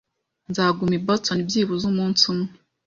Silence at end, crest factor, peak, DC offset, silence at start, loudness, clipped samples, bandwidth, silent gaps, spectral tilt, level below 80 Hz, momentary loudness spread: 0.35 s; 20 dB; -4 dBFS; under 0.1%; 0.5 s; -21 LUFS; under 0.1%; 7.6 kHz; none; -4.5 dB/octave; -58 dBFS; 8 LU